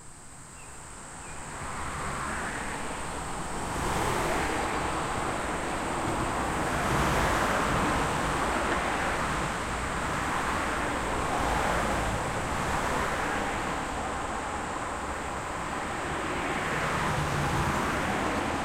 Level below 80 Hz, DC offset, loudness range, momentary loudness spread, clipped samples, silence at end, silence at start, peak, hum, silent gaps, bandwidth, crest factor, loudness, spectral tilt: -42 dBFS; under 0.1%; 5 LU; 8 LU; under 0.1%; 0 s; 0 s; -14 dBFS; none; none; 16.5 kHz; 16 dB; -29 LUFS; -4 dB/octave